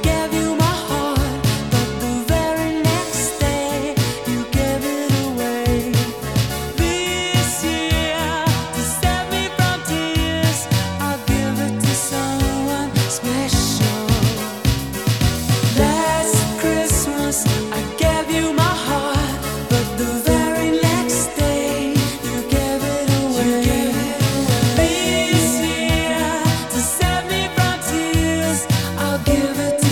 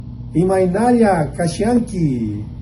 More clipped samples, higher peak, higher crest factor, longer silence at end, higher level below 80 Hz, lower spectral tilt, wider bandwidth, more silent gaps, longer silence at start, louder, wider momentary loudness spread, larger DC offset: neither; about the same, -2 dBFS vs -2 dBFS; about the same, 16 dB vs 14 dB; about the same, 0 s vs 0 s; first, -30 dBFS vs -36 dBFS; second, -4.5 dB/octave vs -7 dB/octave; first, 19.5 kHz vs 11.5 kHz; neither; about the same, 0 s vs 0 s; about the same, -19 LUFS vs -17 LUFS; second, 4 LU vs 8 LU; first, 0.2% vs under 0.1%